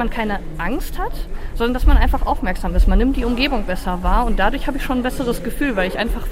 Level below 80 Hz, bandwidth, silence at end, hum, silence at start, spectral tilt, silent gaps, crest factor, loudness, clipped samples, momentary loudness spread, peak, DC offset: -20 dBFS; 16 kHz; 0 s; none; 0 s; -6 dB/octave; none; 16 dB; -20 LUFS; under 0.1%; 8 LU; -2 dBFS; under 0.1%